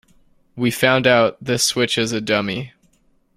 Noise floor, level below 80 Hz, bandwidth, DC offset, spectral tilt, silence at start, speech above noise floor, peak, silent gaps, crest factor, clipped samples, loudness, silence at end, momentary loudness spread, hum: -60 dBFS; -56 dBFS; 16 kHz; under 0.1%; -3.5 dB/octave; 0.55 s; 42 dB; -2 dBFS; none; 18 dB; under 0.1%; -18 LUFS; 0.7 s; 11 LU; none